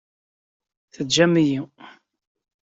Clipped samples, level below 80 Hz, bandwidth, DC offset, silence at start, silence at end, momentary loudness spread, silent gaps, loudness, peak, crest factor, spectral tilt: under 0.1%; -64 dBFS; 8 kHz; under 0.1%; 1 s; 0.9 s; 16 LU; none; -19 LUFS; -4 dBFS; 20 dB; -4.5 dB/octave